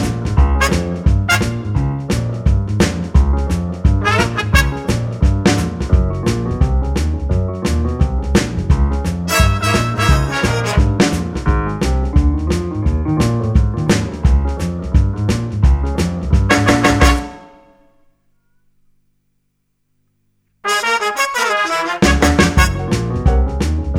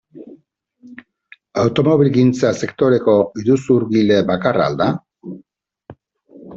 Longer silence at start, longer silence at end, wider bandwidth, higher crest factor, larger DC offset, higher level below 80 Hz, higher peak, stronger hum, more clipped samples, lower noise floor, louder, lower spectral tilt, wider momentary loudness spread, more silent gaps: second, 0 s vs 0.15 s; about the same, 0 s vs 0 s; first, 16 kHz vs 8 kHz; about the same, 16 dB vs 16 dB; neither; first, -20 dBFS vs -54 dBFS; about the same, 0 dBFS vs -2 dBFS; first, 50 Hz at -40 dBFS vs none; neither; first, -66 dBFS vs -55 dBFS; about the same, -16 LUFS vs -16 LUFS; second, -5.5 dB/octave vs -7 dB/octave; second, 6 LU vs 14 LU; neither